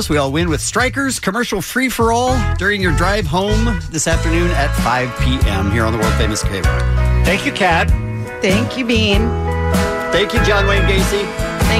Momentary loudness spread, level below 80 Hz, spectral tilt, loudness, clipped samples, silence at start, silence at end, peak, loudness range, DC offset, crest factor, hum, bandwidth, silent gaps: 4 LU; -22 dBFS; -5 dB/octave; -16 LUFS; under 0.1%; 0 s; 0 s; -4 dBFS; 1 LU; under 0.1%; 12 dB; none; 16 kHz; none